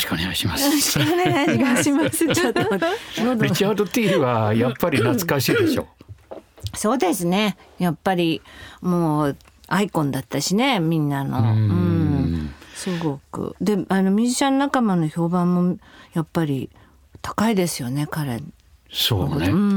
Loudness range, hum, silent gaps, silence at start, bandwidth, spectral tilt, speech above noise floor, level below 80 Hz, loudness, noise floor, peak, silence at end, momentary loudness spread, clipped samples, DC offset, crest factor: 4 LU; none; none; 0 s; over 20 kHz; -5 dB/octave; 21 dB; -50 dBFS; -21 LUFS; -41 dBFS; -4 dBFS; 0 s; 11 LU; under 0.1%; under 0.1%; 16 dB